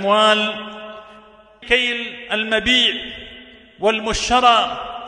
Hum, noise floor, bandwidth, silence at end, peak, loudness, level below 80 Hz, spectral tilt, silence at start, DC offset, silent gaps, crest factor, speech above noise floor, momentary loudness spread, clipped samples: none; -46 dBFS; 11 kHz; 0 s; 0 dBFS; -17 LUFS; -42 dBFS; -2 dB/octave; 0 s; under 0.1%; none; 20 dB; 28 dB; 19 LU; under 0.1%